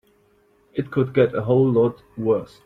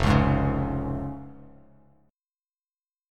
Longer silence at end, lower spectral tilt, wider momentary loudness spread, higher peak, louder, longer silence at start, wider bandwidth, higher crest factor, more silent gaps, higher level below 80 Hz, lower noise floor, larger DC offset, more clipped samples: second, 0.2 s vs 1.65 s; first, -10 dB/octave vs -7.5 dB/octave; second, 10 LU vs 19 LU; about the same, -6 dBFS vs -6 dBFS; first, -21 LUFS vs -26 LUFS; first, 0.75 s vs 0 s; second, 5.4 kHz vs 10 kHz; second, 16 dB vs 22 dB; neither; second, -56 dBFS vs -36 dBFS; second, -59 dBFS vs under -90 dBFS; neither; neither